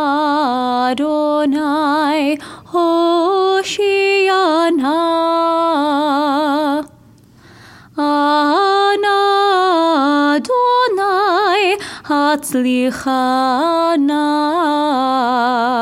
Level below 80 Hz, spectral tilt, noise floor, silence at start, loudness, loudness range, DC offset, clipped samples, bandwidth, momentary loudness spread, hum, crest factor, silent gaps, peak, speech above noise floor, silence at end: -58 dBFS; -3 dB/octave; -45 dBFS; 0 s; -15 LUFS; 3 LU; under 0.1%; under 0.1%; 16 kHz; 4 LU; none; 12 dB; none; -2 dBFS; 31 dB; 0 s